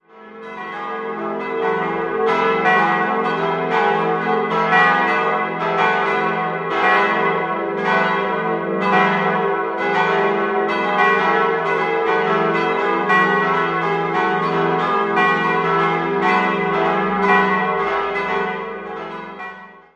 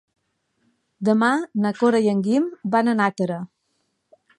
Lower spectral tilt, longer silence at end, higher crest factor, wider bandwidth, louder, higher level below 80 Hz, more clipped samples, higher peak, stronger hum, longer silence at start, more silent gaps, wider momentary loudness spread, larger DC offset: about the same, -6 dB/octave vs -6.5 dB/octave; second, 0.15 s vs 0.95 s; about the same, 16 dB vs 16 dB; second, 8.6 kHz vs 10.5 kHz; first, -18 LUFS vs -21 LUFS; first, -56 dBFS vs -72 dBFS; neither; first, -2 dBFS vs -6 dBFS; neither; second, 0.15 s vs 1 s; neither; about the same, 10 LU vs 8 LU; neither